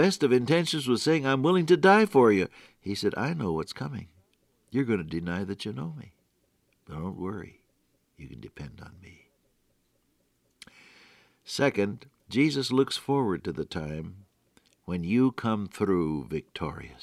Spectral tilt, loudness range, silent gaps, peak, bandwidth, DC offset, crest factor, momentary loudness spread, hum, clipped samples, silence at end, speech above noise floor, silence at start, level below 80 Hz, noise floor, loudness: -6 dB/octave; 18 LU; none; -8 dBFS; 14.5 kHz; under 0.1%; 20 dB; 20 LU; none; under 0.1%; 0.1 s; 45 dB; 0 s; -60 dBFS; -71 dBFS; -27 LUFS